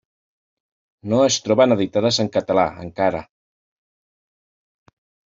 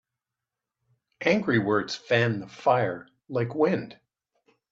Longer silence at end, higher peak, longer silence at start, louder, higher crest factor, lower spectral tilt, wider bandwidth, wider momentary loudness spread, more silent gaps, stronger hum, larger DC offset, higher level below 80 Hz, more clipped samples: first, 2.1 s vs 0.75 s; first, -4 dBFS vs -8 dBFS; second, 1.05 s vs 1.2 s; first, -19 LUFS vs -26 LUFS; about the same, 18 dB vs 20 dB; second, -4 dB/octave vs -6.5 dB/octave; about the same, 7.8 kHz vs 7.8 kHz; about the same, 7 LU vs 8 LU; neither; neither; neither; first, -58 dBFS vs -68 dBFS; neither